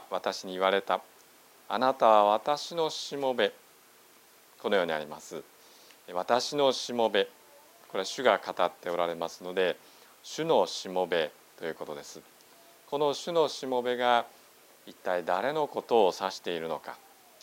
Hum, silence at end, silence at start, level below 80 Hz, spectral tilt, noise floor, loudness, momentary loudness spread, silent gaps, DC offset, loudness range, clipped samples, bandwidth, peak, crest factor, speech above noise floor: none; 0.45 s; 0 s; -80 dBFS; -3.5 dB/octave; -58 dBFS; -29 LUFS; 15 LU; none; under 0.1%; 5 LU; under 0.1%; 16 kHz; -8 dBFS; 24 dB; 29 dB